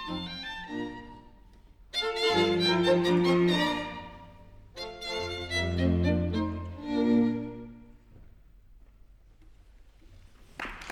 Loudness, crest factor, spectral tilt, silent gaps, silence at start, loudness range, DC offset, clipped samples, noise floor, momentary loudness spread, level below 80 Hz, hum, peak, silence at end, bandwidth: -28 LUFS; 18 dB; -6 dB/octave; none; 0 s; 6 LU; under 0.1%; under 0.1%; -55 dBFS; 20 LU; -50 dBFS; none; -12 dBFS; 0 s; 14.5 kHz